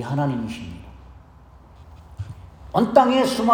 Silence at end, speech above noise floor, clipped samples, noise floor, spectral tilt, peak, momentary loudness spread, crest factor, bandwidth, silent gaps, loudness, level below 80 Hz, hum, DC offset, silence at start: 0 s; 28 dB; under 0.1%; -47 dBFS; -6 dB/octave; -2 dBFS; 22 LU; 22 dB; 19 kHz; none; -20 LUFS; -48 dBFS; none; under 0.1%; 0 s